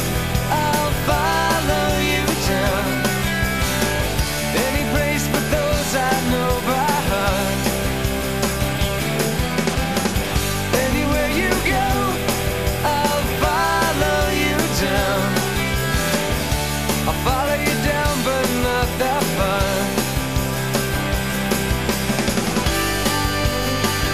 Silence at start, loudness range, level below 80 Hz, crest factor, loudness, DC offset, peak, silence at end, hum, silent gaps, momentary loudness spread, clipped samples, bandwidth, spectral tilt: 0 s; 2 LU; -30 dBFS; 14 dB; -19 LUFS; 1%; -4 dBFS; 0 s; none; none; 3 LU; under 0.1%; 15 kHz; -4 dB/octave